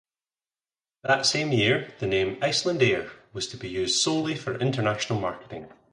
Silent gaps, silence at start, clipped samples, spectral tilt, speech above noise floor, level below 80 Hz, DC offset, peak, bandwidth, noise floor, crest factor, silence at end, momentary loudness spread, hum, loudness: none; 1.05 s; under 0.1%; -4 dB/octave; over 64 dB; -58 dBFS; under 0.1%; -8 dBFS; 11.5 kHz; under -90 dBFS; 20 dB; 0.25 s; 12 LU; none; -25 LUFS